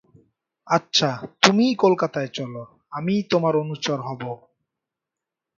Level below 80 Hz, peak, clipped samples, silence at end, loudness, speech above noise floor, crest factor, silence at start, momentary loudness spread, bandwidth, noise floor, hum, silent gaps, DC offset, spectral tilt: -66 dBFS; 0 dBFS; under 0.1%; 1.2 s; -21 LUFS; 65 dB; 24 dB; 0.65 s; 16 LU; 8 kHz; -86 dBFS; none; none; under 0.1%; -4.5 dB/octave